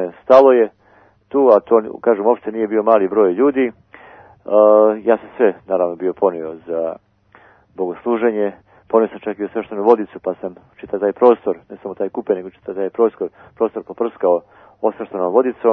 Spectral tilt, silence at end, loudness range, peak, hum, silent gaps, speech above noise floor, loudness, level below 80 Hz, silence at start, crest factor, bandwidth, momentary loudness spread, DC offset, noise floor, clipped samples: -8.5 dB/octave; 0 s; 6 LU; 0 dBFS; none; none; 36 dB; -17 LUFS; -62 dBFS; 0 s; 16 dB; 6 kHz; 13 LU; under 0.1%; -52 dBFS; under 0.1%